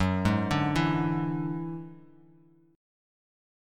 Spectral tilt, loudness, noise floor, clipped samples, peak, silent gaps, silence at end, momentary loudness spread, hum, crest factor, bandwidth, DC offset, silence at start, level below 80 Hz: -7 dB/octave; -28 LUFS; -59 dBFS; under 0.1%; -12 dBFS; none; 1.7 s; 13 LU; none; 20 dB; 13.5 kHz; under 0.1%; 0 s; -50 dBFS